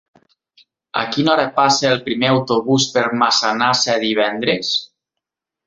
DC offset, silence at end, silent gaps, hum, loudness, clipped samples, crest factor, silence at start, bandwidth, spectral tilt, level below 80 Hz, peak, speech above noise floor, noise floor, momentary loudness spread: under 0.1%; 0.8 s; none; none; -16 LUFS; under 0.1%; 18 dB; 0.95 s; 8 kHz; -3.5 dB/octave; -58 dBFS; 0 dBFS; 66 dB; -83 dBFS; 5 LU